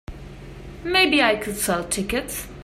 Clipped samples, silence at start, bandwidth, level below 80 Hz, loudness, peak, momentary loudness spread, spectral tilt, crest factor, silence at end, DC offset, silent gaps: under 0.1%; 0.1 s; 16 kHz; -42 dBFS; -21 LUFS; -4 dBFS; 23 LU; -2.5 dB/octave; 20 dB; 0 s; under 0.1%; none